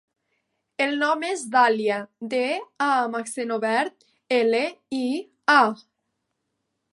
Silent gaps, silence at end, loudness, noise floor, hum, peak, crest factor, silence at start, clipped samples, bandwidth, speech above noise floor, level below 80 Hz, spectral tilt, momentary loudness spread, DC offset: none; 1.15 s; -23 LUFS; -78 dBFS; none; -4 dBFS; 22 dB; 0.8 s; under 0.1%; 11.5 kHz; 55 dB; -80 dBFS; -3 dB/octave; 10 LU; under 0.1%